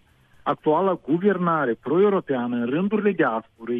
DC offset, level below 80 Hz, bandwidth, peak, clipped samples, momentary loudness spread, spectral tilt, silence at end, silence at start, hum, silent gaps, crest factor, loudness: under 0.1%; -64 dBFS; 3.9 kHz; -8 dBFS; under 0.1%; 5 LU; -10 dB/octave; 0 s; 0.45 s; none; none; 14 dB; -22 LUFS